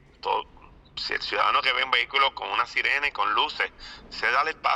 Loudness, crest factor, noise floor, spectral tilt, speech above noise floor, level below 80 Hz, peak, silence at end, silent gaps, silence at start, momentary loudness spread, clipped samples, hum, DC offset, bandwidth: -24 LUFS; 20 dB; -51 dBFS; -1.5 dB/octave; 26 dB; -56 dBFS; -6 dBFS; 0 s; none; 0.25 s; 8 LU; under 0.1%; none; under 0.1%; 11 kHz